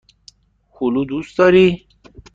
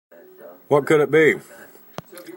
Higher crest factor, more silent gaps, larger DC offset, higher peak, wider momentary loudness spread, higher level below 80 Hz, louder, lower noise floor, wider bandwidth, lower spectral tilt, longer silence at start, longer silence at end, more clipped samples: about the same, 16 dB vs 18 dB; neither; neither; about the same, -2 dBFS vs -4 dBFS; second, 12 LU vs 23 LU; first, -48 dBFS vs -68 dBFS; about the same, -16 LUFS vs -18 LUFS; first, -54 dBFS vs -44 dBFS; second, 7.6 kHz vs 16.5 kHz; about the same, -7 dB/octave vs -6 dB/octave; first, 0.8 s vs 0.45 s; first, 0.6 s vs 0.05 s; neither